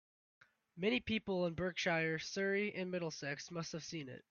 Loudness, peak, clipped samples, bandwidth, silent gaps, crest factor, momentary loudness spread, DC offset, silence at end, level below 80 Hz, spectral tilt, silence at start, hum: -39 LUFS; -22 dBFS; under 0.1%; 7.2 kHz; none; 18 dB; 9 LU; under 0.1%; 0.1 s; -70 dBFS; -4.5 dB/octave; 0.75 s; none